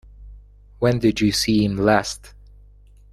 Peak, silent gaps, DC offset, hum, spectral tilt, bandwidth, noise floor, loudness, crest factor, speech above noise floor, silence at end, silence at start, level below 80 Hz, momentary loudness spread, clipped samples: -2 dBFS; none; under 0.1%; 50 Hz at -40 dBFS; -5 dB/octave; 14 kHz; -48 dBFS; -19 LUFS; 20 dB; 29 dB; 0.85 s; 0.2 s; -42 dBFS; 8 LU; under 0.1%